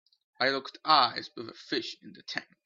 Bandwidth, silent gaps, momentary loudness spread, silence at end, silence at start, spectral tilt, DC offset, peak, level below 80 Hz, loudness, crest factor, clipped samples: 7.6 kHz; none; 19 LU; 0.25 s; 0.4 s; -3 dB/octave; under 0.1%; -8 dBFS; -80 dBFS; -29 LUFS; 24 dB; under 0.1%